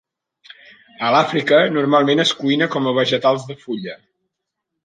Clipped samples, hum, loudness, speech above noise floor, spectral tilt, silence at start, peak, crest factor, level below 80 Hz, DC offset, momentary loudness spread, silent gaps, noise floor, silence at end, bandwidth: under 0.1%; none; -17 LUFS; 62 dB; -5 dB/octave; 1 s; -2 dBFS; 18 dB; -66 dBFS; under 0.1%; 13 LU; none; -79 dBFS; 0.9 s; 9.4 kHz